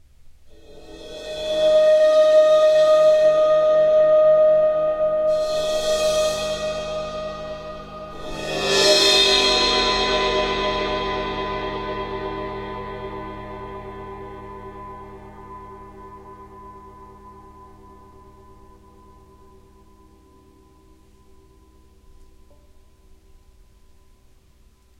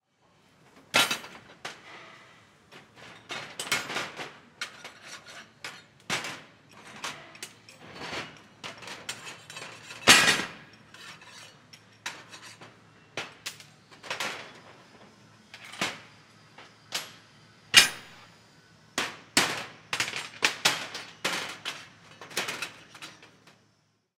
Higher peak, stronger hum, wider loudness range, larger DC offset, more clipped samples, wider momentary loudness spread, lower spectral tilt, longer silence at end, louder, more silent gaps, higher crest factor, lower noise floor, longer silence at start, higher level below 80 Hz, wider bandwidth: about the same, -2 dBFS vs 0 dBFS; neither; first, 22 LU vs 14 LU; neither; neither; about the same, 23 LU vs 23 LU; first, -2.5 dB/octave vs -0.5 dB/octave; first, 7.35 s vs 0.95 s; first, -18 LUFS vs -27 LUFS; neither; second, 18 dB vs 32 dB; second, -54 dBFS vs -70 dBFS; second, 0.25 s vs 0.95 s; first, -44 dBFS vs -70 dBFS; second, 13.5 kHz vs 16.5 kHz